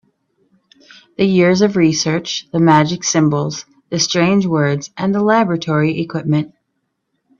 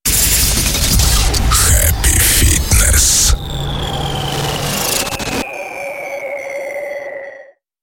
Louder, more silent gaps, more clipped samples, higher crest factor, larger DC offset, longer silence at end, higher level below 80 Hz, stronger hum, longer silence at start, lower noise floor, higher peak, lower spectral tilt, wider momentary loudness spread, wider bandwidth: about the same, -15 LUFS vs -13 LUFS; neither; neither; about the same, 16 dB vs 14 dB; neither; first, 0.9 s vs 0.4 s; second, -56 dBFS vs -20 dBFS; neither; first, 1.2 s vs 0.05 s; first, -71 dBFS vs -39 dBFS; about the same, 0 dBFS vs 0 dBFS; first, -5 dB/octave vs -2.5 dB/octave; second, 8 LU vs 14 LU; second, 7.4 kHz vs 17 kHz